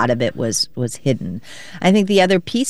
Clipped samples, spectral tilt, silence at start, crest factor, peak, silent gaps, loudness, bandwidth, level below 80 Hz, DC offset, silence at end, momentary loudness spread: under 0.1%; -4.5 dB/octave; 0 s; 16 dB; -2 dBFS; none; -18 LUFS; 12.5 kHz; -52 dBFS; 1%; 0 s; 14 LU